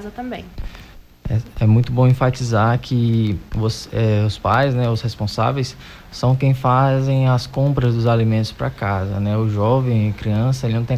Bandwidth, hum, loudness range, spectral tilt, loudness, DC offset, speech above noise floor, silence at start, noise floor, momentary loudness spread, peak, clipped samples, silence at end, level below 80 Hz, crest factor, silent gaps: 12.5 kHz; none; 2 LU; -7.5 dB/octave; -18 LUFS; under 0.1%; 23 dB; 0 s; -41 dBFS; 11 LU; -4 dBFS; under 0.1%; 0 s; -38 dBFS; 14 dB; none